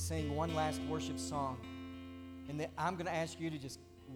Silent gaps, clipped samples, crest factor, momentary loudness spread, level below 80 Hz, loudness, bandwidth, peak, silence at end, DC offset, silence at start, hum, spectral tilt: none; under 0.1%; 18 dB; 13 LU; -58 dBFS; -40 LUFS; 18 kHz; -22 dBFS; 0 s; under 0.1%; 0 s; none; -5 dB/octave